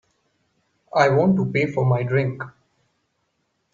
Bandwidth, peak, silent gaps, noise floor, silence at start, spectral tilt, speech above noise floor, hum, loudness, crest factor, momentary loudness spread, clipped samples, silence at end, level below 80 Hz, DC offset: 7.2 kHz; -4 dBFS; none; -72 dBFS; 0.95 s; -8 dB/octave; 52 dB; none; -20 LUFS; 20 dB; 12 LU; under 0.1%; 1.25 s; -62 dBFS; under 0.1%